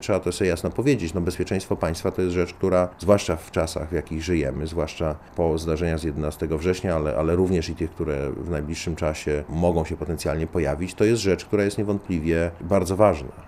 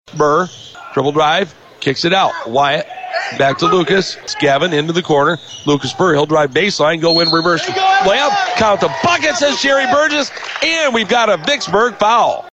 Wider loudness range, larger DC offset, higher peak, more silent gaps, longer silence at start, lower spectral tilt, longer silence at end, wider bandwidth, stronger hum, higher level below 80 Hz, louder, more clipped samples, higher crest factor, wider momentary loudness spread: about the same, 3 LU vs 3 LU; neither; about the same, -4 dBFS vs -2 dBFS; neither; about the same, 0 s vs 0.1 s; first, -6 dB/octave vs -4 dB/octave; about the same, 0 s vs 0.05 s; first, 14.5 kHz vs 8.8 kHz; neither; first, -40 dBFS vs -50 dBFS; second, -24 LUFS vs -14 LUFS; neither; first, 20 dB vs 12 dB; about the same, 7 LU vs 7 LU